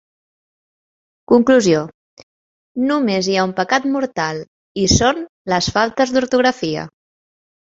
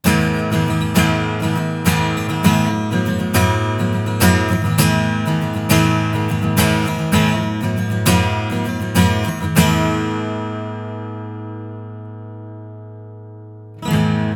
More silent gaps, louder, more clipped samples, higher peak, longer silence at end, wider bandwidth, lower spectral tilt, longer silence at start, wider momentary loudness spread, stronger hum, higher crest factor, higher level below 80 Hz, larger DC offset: first, 1.94-2.17 s, 2.23-2.75 s, 4.47-4.75 s, 5.29-5.45 s vs none; about the same, -17 LUFS vs -17 LUFS; neither; about the same, -2 dBFS vs 0 dBFS; first, 0.9 s vs 0 s; second, 7.8 kHz vs over 20 kHz; about the same, -4.5 dB/octave vs -5.5 dB/octave; first, 1.3 s vs 0.05 s; second, 13 LU vs 18 LU; neither; about the same, 18 dB vs 18 dB; about the same, -40 dBFS vs -38 dBFS; neither